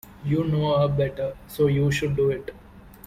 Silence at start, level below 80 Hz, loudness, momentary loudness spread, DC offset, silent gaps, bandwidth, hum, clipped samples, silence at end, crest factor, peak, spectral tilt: 0.05 s; -46 dBFS; -24 LUFS; 10 LU; under 0.1%; none; 15.5 kHz; none; under 0.1%; 0.2 s; 14 dB; -10 dBFS; -7 dB/octave